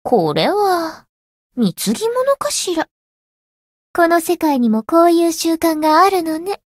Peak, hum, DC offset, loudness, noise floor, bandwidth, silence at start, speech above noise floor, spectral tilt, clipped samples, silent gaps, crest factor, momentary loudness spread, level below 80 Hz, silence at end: -2 dBFS; none; under 0.1%; -16 LUFS; under -90 dBFS; 16 kHz; 0.05 s; over 75 dB; -4 dB/octave; under 0.1%; 1.09-1.50 s, 2.91-3.94 s; 16 dB; 10 LU; -58 dBFS; 0.2 s